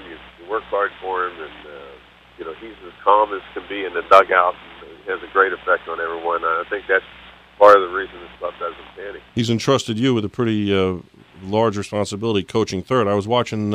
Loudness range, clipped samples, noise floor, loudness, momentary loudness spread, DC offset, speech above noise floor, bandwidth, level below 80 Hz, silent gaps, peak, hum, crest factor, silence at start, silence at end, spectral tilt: 5 LU; under 0.1%; -44 dBFS; -19 LUFS; 21 LU; under 0.1%; 25 dB; 13 kHz; -54 dBFS; none; 0 dBFS; none; 20 dB; 0 s; 0 s; -5.5 dB/octave